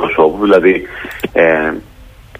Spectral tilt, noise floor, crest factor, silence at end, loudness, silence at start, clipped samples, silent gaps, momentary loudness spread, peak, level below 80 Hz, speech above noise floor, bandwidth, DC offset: -6.5 dB/octave; -37 dBFS; 14 dB; 0.35 s; -12 LUFS; 0 s; under 0.1%; none; 14 LU; 0 dBFS; -40 dBFS; 25 dB; 15.5 kHz; under 0.1%